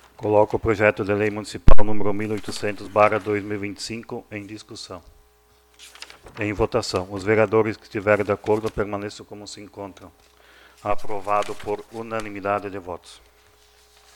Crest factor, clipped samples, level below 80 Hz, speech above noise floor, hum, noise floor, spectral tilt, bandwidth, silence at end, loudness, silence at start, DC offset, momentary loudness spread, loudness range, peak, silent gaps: 20 dB; 0.3%; -30 dBFS; 39 dB; 60 Hz at -60 dBFS; -57 dBFS; -6 dB/octave; 10.5 kHz; 1.2 s; -24 LUFS; 0.2 s; under 0.1%; 18 LU; 8 LU; 0 dBFS; none